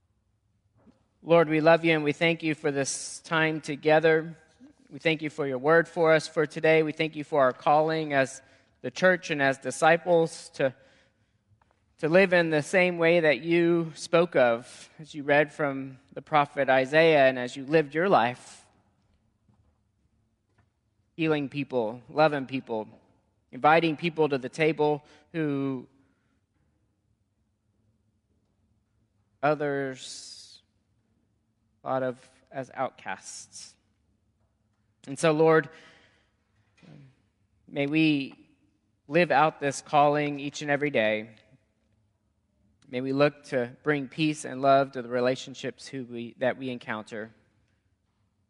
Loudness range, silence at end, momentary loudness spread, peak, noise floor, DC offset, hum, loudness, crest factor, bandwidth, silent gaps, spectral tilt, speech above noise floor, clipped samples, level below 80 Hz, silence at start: 11 LU; 1.2 s; 17 LU; -6 dBFS; -74 dBFS; under 0.1%; none; -25 LUFS; 22 dB; 11.5 kHz; none; -5 dB/octave; 48 dB; under 0.1%; -74 dBFS; 1.25 s